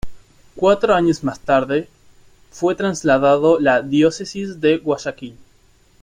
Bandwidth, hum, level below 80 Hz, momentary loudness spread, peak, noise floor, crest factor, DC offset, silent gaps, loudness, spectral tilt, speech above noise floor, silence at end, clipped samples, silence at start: 11 kHz; none; -46 dBFS; 11 LU; -2 dBFS; -53 dBFS; 16 dB; under 0.1%; none; -17 LUFS; -5.5 dB/octave; 37 dB; 0.7 s; under 0.1%; 0.05 s